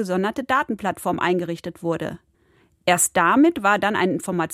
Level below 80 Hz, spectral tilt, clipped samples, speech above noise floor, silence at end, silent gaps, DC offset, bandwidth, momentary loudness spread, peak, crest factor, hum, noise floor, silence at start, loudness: -58 dBFS; -4 dB/octave; under 0.1%; 39 dB; 0 s; none; under 0.1%; 16 kHz; 11 LU; -4 dBFS; 18 dB; none; -60 dBFS; 0 s; -21 LUFS